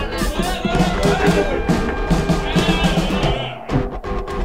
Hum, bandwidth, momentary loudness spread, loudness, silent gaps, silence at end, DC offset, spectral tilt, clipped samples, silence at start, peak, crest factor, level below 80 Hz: none; 16 kHz; 6 LU; -19 LUFS; none; 0 s; 0.8%; -5.5 dB/octave; under 0.1%; 0 s; -4 dBFS; 14 dB; -26 dBFS